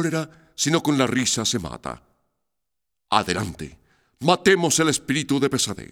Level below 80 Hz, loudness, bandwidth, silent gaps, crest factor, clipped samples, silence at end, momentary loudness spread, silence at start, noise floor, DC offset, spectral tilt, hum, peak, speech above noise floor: -52 dBFS; -21 LUFS; 18.5 kHz; none; 22 dB; under 0.1%; 0.1 s; 17 LU; 0 s; -85 dBFS; under 0.1%; -3.5 dB/octave; none; -2 dBFS; 63 dB